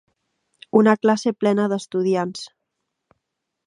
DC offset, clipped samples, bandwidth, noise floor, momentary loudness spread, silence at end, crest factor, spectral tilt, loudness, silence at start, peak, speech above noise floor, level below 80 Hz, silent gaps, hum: under 0.1%; under 0.1%; 10.5 kHz; -79 dBFS; 13 LU; 1.2 s; 20 dB; -6 dB/octave; -20 LUFS; 0.75 s; -2 dBFS; 60 dB; -72 dBFS; none; none